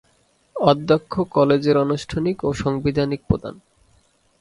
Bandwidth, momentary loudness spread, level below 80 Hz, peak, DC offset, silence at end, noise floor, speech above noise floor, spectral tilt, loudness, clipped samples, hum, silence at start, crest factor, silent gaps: 11.5 kHz; 7 LU; -44 dBFS; 0 dBFS; under 0.1%; 0.85 s; -61 dBFS; 42 dB; -7 dB/octave; -20 LUFS; under 0.1%; none; 0.55 s; 20 dB; none